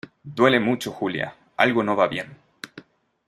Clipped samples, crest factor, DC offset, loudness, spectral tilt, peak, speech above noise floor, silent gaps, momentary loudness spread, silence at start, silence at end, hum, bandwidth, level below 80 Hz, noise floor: under 0.1%; 22 dB; under 0.1%; -22 LUFS; -5.5 dB/octave; -2 dBFS; 27 dB; none; 22 LU; 0.25 s; 0.45 s; none; 15 kHz; -64 dBFS; -48 dBFS